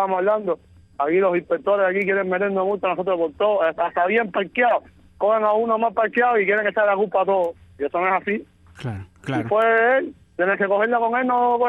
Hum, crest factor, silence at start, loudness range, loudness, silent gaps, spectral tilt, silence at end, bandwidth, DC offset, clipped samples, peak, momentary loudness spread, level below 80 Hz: none; 14 dB; 0 s; 2 LU; -20 LUFS; none; -7.5 dB/octave; 0 s; 7.8 kHz; under 0.1%; under 0.1%; -8 dBFS; 9 LU; -60 dBFS